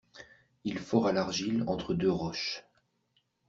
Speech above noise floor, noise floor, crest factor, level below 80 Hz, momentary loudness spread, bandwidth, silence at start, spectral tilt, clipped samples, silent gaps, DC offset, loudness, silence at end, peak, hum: 44 dB; -75 dBFS; 22 dB; -60 dBFS; 10 LU; 7.8 kHz; 0.15 s; -5.5 dB/octave; under 0.1%; none; under 0.1%; -31 LUFS; 0.9 s; -12 dBFS; none